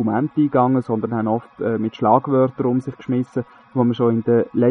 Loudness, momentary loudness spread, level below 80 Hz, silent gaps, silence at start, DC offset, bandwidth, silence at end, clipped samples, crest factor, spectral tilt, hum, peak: -20 LUFS; 7 LU; -62 dBFS; none; 0 s; under 0.1%; 6.2 kHz; 0 s; under 0.1%; 18 dB; -10 dB/octave; none; 0 dBFS